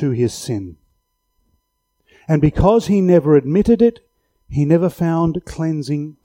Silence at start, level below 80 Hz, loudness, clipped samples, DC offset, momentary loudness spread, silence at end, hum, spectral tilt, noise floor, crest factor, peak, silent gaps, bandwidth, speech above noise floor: 0 s; -36 dBFS; -16 LUFS; under 0.1%; under 0.1%; 12 LU; 0.15 s; none; -8 dB/octave; -69 dBFS; 16 dB; -2 dBFS; none; 16 kHz; 54 dB